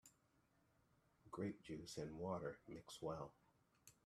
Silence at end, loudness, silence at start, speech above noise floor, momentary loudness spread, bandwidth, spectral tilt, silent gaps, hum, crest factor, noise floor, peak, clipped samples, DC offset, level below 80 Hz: 0.15 s; -51 LUFS; 0.05 s; 30 dB; 10 LU; 14 kHz; -5.5 dB/octave; none; none; 22 dB; -80 dBFS; -32 dBFS; under 0.1%; under 0.1%; -78 dBFS